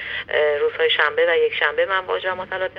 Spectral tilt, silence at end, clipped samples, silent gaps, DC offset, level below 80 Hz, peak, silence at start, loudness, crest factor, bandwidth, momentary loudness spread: -4.5 dB/octave; 0 s; under 0.1%; none; under 0.1%; -58 dBFS; -4 dBFS; 0 s; -19 LUFS; 18 dB; 5.2 kHz; 7 LU